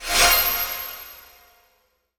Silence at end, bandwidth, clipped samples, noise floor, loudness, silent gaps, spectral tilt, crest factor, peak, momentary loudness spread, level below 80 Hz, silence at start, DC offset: 1 s; over 20 kHz; under 0.1%; -66 dBFS; -18 LUFS; none; 0.5 dB/octave; 22 dB; -2 dBFS; 22 LU; -40 dBFS; 0 s; under 0.1%